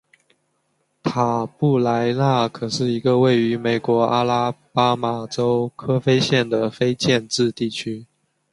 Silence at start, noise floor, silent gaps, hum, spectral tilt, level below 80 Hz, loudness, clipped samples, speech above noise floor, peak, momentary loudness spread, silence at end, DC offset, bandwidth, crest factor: 1.05 s; -69 dBFS; none; none; -6 dB/octave; -58 dBFS; -20 LUFS; under 0.1%; 49 dB; -2 dBFS; 7 LU; 0.5 s; under 0.1%; 11.5 kHz; 18 dB